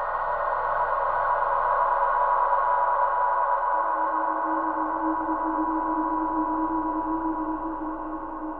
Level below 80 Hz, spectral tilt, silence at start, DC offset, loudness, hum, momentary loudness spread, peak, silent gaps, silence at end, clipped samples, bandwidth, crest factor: -48 dBFS; -9 dB/octave; 0 s; under 0.1%; -25 LUFS; none; 7 LU; -12 dBFS; none; 0 s; under 0.1%; 4.5 kHz; 14 dB